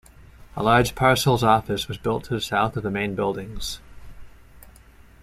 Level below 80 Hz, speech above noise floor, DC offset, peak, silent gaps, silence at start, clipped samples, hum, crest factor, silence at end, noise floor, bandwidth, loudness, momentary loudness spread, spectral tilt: -44 dBFS; 27 dB; under 0.1%; -6 dBFS; none; 0.2 s; under 0.1%; none; 18 dB; 0.55 s; -49 dBFS; 15.5 kHz; -22 LUFS; 13 LU; -5 dB/octave